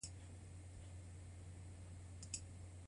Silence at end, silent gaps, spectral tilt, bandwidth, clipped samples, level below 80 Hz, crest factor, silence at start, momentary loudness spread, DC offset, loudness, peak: 0 s; none; -4 dB/octave; 11 kHz; under 0.1%; -60 dBFS; 24 dB; 0 s; 7 LU; under 0.1%; -54 LUFS; -30 dBFS